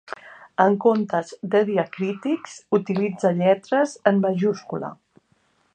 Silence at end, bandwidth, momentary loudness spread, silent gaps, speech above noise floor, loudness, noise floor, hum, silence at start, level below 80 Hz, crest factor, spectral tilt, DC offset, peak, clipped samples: 0.8 s; 9.4 kHz; 12 LU; none; 43 dB; -22 LUFS; -65 dBFS; none; 0.1 s; -72 dBFS; 20 dB; -7 dB/octave; under 0.1%; -2 dBFS; under 0.1%